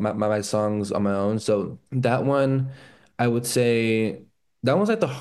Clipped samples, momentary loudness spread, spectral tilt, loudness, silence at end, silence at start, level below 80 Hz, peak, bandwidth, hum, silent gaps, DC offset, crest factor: under 0.1%; 7 LU; -6 dB/octave; -23 LUFS; 0 s; 0 s; -64 dBFS; -6 dBFS; 12.5 kHz; none; none; under 0.1%; 16 dB